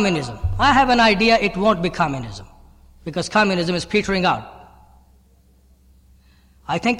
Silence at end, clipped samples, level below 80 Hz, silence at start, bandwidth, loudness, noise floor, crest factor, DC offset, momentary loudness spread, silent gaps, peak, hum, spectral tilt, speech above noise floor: 0 s; under 0.1%; -38 dBFS; 0 s; 12.5 kHz; -18 LUFS; -54 dBFS; 16 dB; under 0.1%; 16 LU; none; -4 dBFS; none; -5 dB/octave; 36 dB